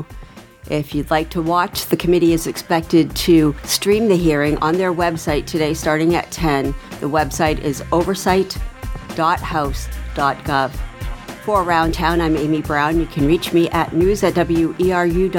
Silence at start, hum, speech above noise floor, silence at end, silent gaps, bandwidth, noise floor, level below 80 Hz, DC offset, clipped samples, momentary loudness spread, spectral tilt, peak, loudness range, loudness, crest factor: 0 s; none; 21 dB; 0 s; none; 19 kHz; -38 dBFS; -32 dBFS; under 0.1%; under 0.1%; 10 LU; -5.5 dB/octave; 0 dBFS; 4 LU; -18 LUFS; 18 dB